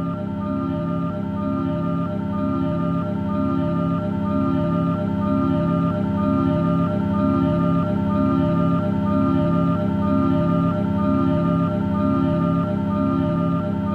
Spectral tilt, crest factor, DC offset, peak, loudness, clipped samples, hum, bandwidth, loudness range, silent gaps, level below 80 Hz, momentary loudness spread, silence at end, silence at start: -10 dB/octave; 12 dB; under 0.1%; -8 dBFS; -21 LUFS; under 0.1%; none; 4.6 kHz; 3 LU; none; -42 dBFS; 5 LU; 0 s; 0 s